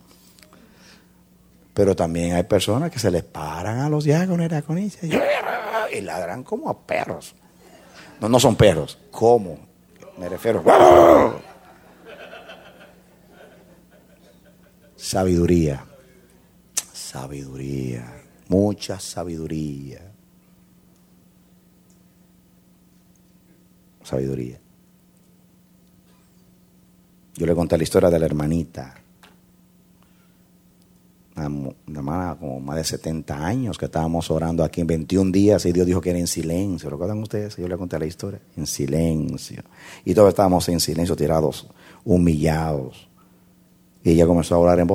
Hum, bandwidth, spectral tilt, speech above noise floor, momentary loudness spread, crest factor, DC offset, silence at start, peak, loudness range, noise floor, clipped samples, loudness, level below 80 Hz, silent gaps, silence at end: none; 16.5 kHz; -6 dB/octave; 35 dB; 17 LU; 22 dB; under 0.1%; 1.75 s; 0 dBFS; 17 LU; -55 dBFS; under 0.1%; -20 LUFS; -44 dBFS; none; 0 s